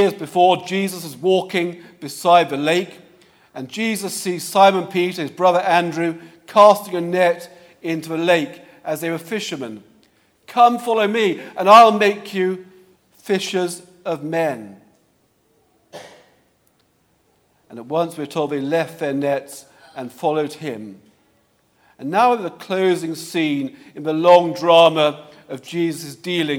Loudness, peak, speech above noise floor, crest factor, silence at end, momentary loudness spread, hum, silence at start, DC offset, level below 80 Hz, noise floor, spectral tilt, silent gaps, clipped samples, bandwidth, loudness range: -18 LUFS; 0 dBFS; 44 dB; 18 dB; 0 s; 19 LU; none; 0 s; under 0.1%; -72 dBFS; -62 dBFS; -4.5 dB/octave; none; under 0.1%; 17.5 kHz; 10 LU